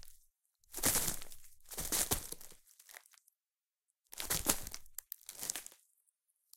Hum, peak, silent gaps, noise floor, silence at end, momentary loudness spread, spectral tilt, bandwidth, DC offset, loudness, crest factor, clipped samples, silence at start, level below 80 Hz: none; -10 dBFS; none; under -90 dBFS; 0.85 s; 23 LU; -1.5 dB/octave; 17 kHz; under 0.1%; -37 LUFS; 32 dB; under 0.1%; 0 s; -54 dBFS